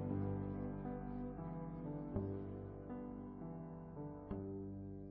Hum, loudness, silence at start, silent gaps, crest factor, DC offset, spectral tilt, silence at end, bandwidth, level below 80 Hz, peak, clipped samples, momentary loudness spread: none; -47 LUFS; 0 s; none; 20 dB; under 0.1%; -11 dB/octave; 0 s; 3.6 kHz; -58 dBFS; -26 dBFS; under 0.1%; 7 LU